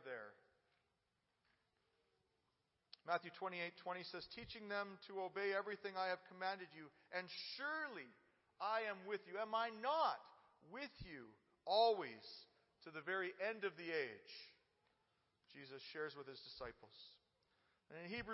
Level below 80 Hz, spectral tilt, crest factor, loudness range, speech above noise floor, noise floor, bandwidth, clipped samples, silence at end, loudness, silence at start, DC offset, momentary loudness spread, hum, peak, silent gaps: -80 dBFS; -1 dB/octave; 24 dB; 10 LU; 41 dB; -87 dBFS; 5.8 kHz; under 0.1%; 0 s; -45 LUFS; 0 s; under 0.1%; 19 LU; none; -24 dBFS; none